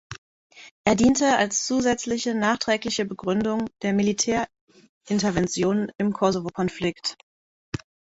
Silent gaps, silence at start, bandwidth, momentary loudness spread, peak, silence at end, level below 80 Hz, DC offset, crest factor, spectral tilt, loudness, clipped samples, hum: 0.18-0.50 s, 0.71-0.84 s, 4.61-4.67 s, 4.89-5.01 s, 7.23-7.72 s; 0.1 s; 8 kHz; 12 LU; -6 dBFS; 0.35 s; -52 dBFS; under 0.1%; 20 dB; -4 dB/octave; -24 LUFS; under 0.1%; none